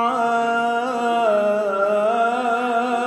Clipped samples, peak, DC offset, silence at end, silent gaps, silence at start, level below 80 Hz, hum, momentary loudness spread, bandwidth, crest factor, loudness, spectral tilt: under 0.1%; -8 dBFS; under 0.1%; 0 s; none; 0 s; -86 dBFS; none; 3 LU; 12 kHz; 12 dB; -20 LUFS; -4.5 dB/octave